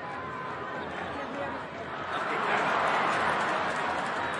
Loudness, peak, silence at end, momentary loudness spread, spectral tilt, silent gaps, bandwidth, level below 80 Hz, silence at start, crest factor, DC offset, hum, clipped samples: -30 LUFS; -14 dBFS; 0 s; 10 LU; -4 dB/octave; none; 11.5 kHz; -66 dBFS; 0 s; 18 dB; under 0.1%; none; under 0.1%